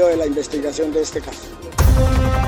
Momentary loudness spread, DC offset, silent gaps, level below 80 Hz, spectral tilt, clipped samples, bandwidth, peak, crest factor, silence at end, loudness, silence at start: 13 LU; under 0.1%; none; -22 dBFS; -6 dB/octave; under 0.1%; over 20 kHz; -4 dBFS; 14 dB; 0 s; -19 LUFS; 0 s